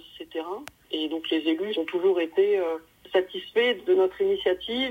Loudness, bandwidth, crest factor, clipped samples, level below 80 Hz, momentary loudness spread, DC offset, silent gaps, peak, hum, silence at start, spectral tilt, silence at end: -26 LUFS; 15.5 kHz; 16 dB; under 0.1%; -64 dBFS; 12 LU; under 0.1%; none; -10 dBFS; none; 0.05 s; -4.5 dB/octave; 0 s